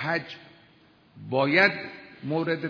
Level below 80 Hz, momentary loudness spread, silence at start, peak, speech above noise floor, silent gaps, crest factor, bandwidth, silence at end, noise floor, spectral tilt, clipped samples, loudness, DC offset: -72 dBFS; 22 LU; 0 s; -6 dBFS; 32 dB; none; 22 dB; 5.4 kHz; 0 s; -58 dBFS; -7 dB/octave; under 0.1%; -25 LUFS; under 0.1%